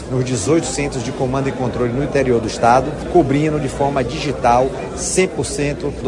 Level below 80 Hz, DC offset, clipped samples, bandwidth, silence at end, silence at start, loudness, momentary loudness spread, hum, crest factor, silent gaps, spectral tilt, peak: -36 dBFS; under 0.1%; under 0.1%; 11.5 kHz; 0 s; 0 s; -18 LUFS; 7 LU; none; 16 dB; none; -5.5 dB/octave; 0 dBFS